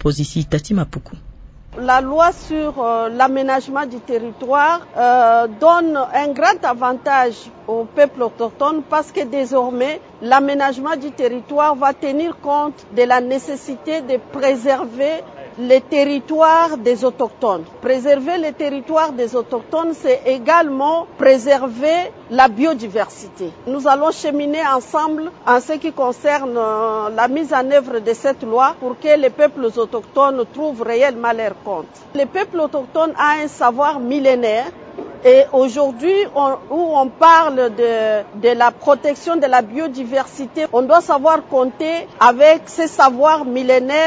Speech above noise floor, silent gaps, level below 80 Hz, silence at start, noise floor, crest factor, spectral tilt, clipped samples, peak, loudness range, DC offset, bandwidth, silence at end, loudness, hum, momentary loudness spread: 21 dB; none; -48 dBFS; 0 s; -36 dBFS; 16 dB; -5.5 dB/octave; under 0.1%; 0 dBFS; 4 LU; under 0.1%; 8 kHz; 0 s; -16 LUFS; none; 10 LU